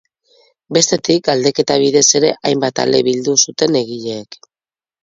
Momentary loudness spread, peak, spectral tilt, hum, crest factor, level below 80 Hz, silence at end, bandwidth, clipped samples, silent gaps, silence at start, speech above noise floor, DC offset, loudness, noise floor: 9 LU; 0 dBFS; -3 dB/octave; none; 16 dB; -58 dBFS; 0.7 s; 7.8 kHz; under 0.1%; none; 0.7 s; over 76 dB; under 0.1%; -14 LUFS; under -90 dBFS